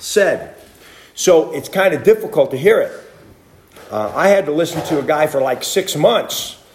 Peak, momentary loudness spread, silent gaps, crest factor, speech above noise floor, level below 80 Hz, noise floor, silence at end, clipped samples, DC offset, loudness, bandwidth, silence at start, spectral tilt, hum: 0 dBFS; 10 LU; none; 16 dB; 31 dB; -56 dBFS; -46 dBFS; 0.2 s; under 0.1%; under 0.1%; -16 LUFS; 16 kHz; 0 s; -4 dB/octave; none